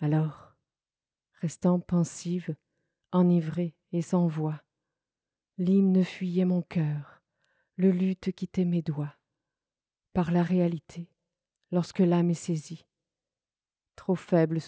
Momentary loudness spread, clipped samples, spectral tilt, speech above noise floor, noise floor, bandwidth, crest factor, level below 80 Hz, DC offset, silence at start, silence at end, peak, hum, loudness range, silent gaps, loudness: 15 LU; under 0.1%; -8 dB/octave; over 63 dB; under -90 dBFS; 8 kHz; 16 dB; -64 dBFS; under 0.1%; 0 s; 0 s; -12 dBFS; none; 4 LU; none; -28 LUFS